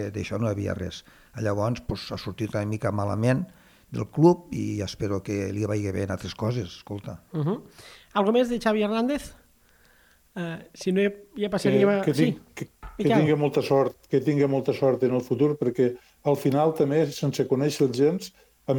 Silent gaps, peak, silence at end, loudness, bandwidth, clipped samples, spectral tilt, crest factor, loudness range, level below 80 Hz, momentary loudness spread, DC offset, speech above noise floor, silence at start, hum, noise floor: none; -4 dBFS; 0 s; -25 LUFS; 19 kHz; under 0.1%; -7 dB/octave; 20 dB; 5 LU; -54 dBFS; 14 LU; under 0.1%; 34 dB; 0 s; none; -59 dBFS